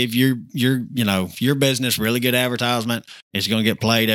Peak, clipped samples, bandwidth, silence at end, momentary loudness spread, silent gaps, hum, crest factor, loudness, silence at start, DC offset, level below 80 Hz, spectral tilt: -2 dBFS; under 0.1%; 18 kHz; 0 s; 5 LU; 3.22-3.31 s; none; 18 dB; -20 LUFS; 0 s; under 0.1%; -58 dBFS; -4.5 dB/octave